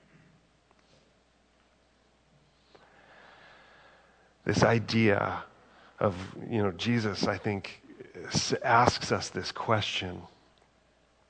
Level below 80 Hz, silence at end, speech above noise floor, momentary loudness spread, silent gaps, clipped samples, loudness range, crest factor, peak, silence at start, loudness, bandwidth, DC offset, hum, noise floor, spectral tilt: -60 dBFS; 1.05 s; 38 dB; 16 LU; none; under 0.1%; 4 LU; 24 dB; -6 dBFS; 4.45 s; -29 LUFS; 9.4 kHz; under 0.1%; none; -66 dBFS; -5 dB/octave